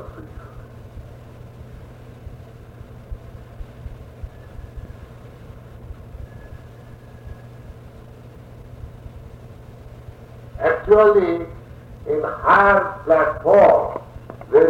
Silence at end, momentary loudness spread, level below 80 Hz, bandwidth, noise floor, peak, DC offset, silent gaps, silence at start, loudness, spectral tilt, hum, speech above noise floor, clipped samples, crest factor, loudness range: 0 s; 28 LU; -42 dBFS; 7.6 kHz; -41 dBFS; -2 dBFS; under 0.1%; none; 0 s; -16 LUFS; -8 dB/octave; none; 26 dB; under 0.1%; 20 dB; 24 LU